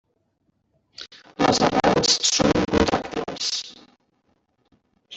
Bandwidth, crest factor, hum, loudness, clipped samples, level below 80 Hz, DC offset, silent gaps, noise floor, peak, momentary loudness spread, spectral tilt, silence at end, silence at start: 8.4 kHz; 20 dB; none; -20 LUFS; under 0.1%; -46 dBFS; under 0.1%; none; -70 dBFS; -4 dBFS; 22 LU; -3 dB/octave; 0 s; 1 s